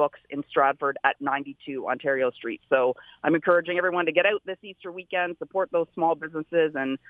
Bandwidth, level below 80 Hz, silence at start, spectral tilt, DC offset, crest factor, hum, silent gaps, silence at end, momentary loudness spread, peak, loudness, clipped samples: 3.9 kHz; -74 dBFS; 0 s; -7.5 dB/octave; under 0.1%; 20 dB; none; none; 0.15 s; 12 LU; -4 dBFS; -25 LUFS; under 0.1%